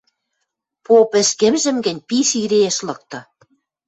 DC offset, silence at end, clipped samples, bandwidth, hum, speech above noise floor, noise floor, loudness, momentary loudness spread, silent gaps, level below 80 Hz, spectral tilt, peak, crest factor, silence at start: under 0.1%; 0.65 s; under 0.1%; 8.2 kHz; none; 59 dB; -76 dBFS; -16 LUFS; 16 LU; none; -62 dBFS; -3 dB/octave; -2 dBFS; 16 dB; 0.9 s